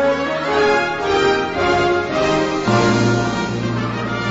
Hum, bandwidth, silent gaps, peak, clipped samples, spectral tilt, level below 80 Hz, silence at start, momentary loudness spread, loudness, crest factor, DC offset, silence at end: none; 8 kHz; none; -2 dBFS; under 0.1%; -5.5 dB/octave; -42 dBFS; 0 s; 6 LU; -17 LUFS; 14 dB; under 0.1%; 0 s